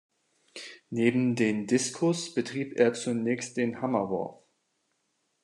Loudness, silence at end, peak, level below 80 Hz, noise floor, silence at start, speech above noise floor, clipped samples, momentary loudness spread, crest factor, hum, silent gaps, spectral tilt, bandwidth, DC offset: -28 LUFS; 1.1 s; -10 dBFS; -78 dBFS; -76 dBFS; 0.55 s; 49 dB; under 0.1%; 14 LU; 20 dB; none; none; -5 dB/octave; 11 kHz; under 0.1%